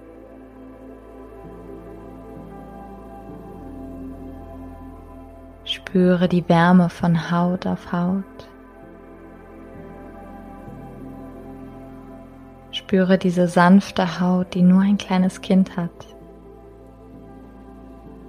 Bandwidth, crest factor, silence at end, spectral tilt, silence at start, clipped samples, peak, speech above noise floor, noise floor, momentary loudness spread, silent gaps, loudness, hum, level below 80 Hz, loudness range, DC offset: 10.5 kHz; 20 dB; 0 s; -7.5 dB/octave; 0.3 s; under 0.1%; -2 dBFS; 26 dB; -43 dBFS; 26 LU; none; -19 LUFS; none; -48 dBFS; 21 LU; under 0.1%